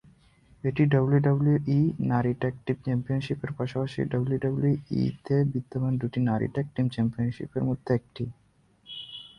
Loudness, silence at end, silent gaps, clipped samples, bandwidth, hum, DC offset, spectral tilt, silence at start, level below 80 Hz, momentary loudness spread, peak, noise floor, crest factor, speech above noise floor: -27 LUFS; 0.1 s; none; under 0.1%; 6 kHz; none; under 0.1%; -9.5 dB/octave; 0.65 s; -56 dBFS; 9 LU; -10 dBFS; -61 dBFS; 18 dB; 35 dB